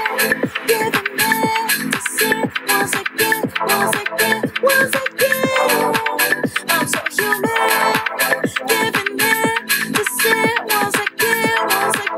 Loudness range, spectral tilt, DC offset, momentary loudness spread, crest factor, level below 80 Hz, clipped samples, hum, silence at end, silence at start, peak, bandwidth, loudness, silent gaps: 1 LU; -2 dB/octave; under 0.1%; 3 LU; 14 dB; -60 dBFS; under 0.1%; none; 0 s; 0 s; -2 dBFS; 16.5 kHz; -16 LUFS; none